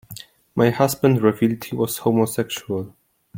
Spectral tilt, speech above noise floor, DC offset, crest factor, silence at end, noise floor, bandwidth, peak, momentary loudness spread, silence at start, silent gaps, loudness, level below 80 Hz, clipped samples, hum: -6 dB/octave; 22 dB; under 0.1%; 18 dB; 0 s; -42 dBFS; 17 kHz; -2 dBFS; 14 LU; 0.1 s; none; -21 LUFS; -56 dBFS; under 0.1%; none